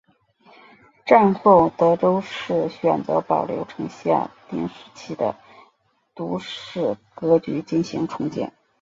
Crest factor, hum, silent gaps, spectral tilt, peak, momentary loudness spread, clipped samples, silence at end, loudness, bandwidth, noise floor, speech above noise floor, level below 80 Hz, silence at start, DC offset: 20 dB; none; none; -7 dB/octave; -2 dBFS; 16 LU; under 0.1%; 0.3 s; -21 LUFS; 7.6 kHz; -64 dBFS; 43 dB; -60 dBFS; 1.05 s; under 0.1%